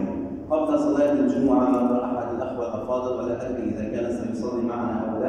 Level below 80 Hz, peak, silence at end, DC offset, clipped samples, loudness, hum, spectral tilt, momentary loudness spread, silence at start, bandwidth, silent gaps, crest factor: -50 dBFS; -8 dBFS; 0 s; under 0.1%; under 0.1%; -24 LUFS; none; -8 dB/octave; 8 LU; 0 s; 9.4 kHz; none; 16 dB